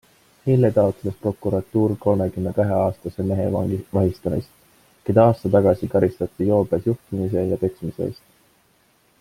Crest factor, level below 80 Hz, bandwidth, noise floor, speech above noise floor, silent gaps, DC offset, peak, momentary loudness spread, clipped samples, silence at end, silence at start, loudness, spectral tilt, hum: 20 dB; -52 dBFS; 16 kHz; -60 dBFS; 40 dB; none; under 0.1%; -2 dBFS; 10 LU; under 0.1%; 1.1 s; 0.45 s; -21 LUFS; -9.5 dB/octave; none